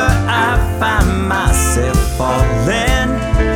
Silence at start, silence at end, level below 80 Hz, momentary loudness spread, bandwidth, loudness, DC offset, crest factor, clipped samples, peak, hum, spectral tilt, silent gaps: 0 s; 0 s; -18 dBFS; 2 LU; 17.5 kHz; -15 LUFS; under 0.1%; 12 dB; under 0.1%; 0 dBFS; none; -5 dB/octave; none